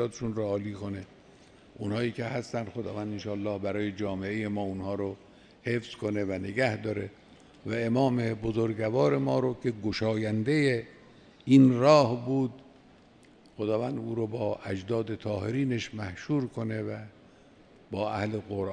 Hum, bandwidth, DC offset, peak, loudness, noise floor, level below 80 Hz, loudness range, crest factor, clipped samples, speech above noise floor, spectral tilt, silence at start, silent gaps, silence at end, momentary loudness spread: none; 10 kHz; under 0.1%; -8 dBFS; -29 LUFS; -57 dBFS; -62 dBFS; 9 LU; 22 dB; under 0.1%; 28 dB; -7 dB/octave; 0 s; none; 0 s; 12 LU